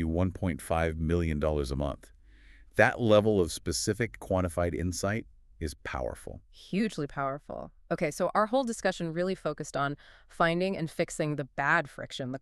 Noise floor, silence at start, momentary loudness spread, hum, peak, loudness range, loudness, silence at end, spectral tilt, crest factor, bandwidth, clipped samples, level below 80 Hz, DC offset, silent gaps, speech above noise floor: -54 dBFS; 0 s; 13 LU; none; -8 dBFS; 5 LU; -30 LUFS; 0.05 s; -5.5 dB/octave; 22 dB; 13.5 kHz; under 0.1%; -46 dBFS; under 0.1%; none; 25 dB